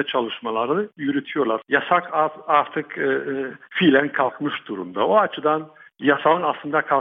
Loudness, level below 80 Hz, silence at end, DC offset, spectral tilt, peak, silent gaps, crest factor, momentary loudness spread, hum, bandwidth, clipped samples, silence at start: -21 LUFS; -70 dBFS; 0 s; under 0.1%; -8 dB/octave; -2 dBFS; none; 20 dB; 10 LU; none; 3.9 kHz; under 0.1%; 0 s